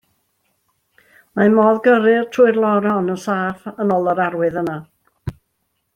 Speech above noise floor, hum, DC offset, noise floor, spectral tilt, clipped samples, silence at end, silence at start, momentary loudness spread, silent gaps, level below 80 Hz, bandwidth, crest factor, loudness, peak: 54 dB; none; under 0.1%; -70 dBFS; -7.5 dB/octave; under 0.1%; 0.65 s; 1.35 s; 19 LU; none; -52 dBFS; 13 kHz; 16 dB; -16 LUFS; -2 dBFS